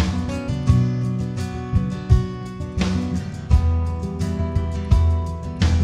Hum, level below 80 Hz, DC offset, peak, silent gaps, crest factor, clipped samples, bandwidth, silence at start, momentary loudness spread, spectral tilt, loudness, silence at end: none; -26 dBFS; under 0.1%; -4 dBFS; none; 16 dB; under 0.1%; 9.8 kHz; 0 s; 9 LU; -7.5 dB/octave; -22 LUFS; 0 s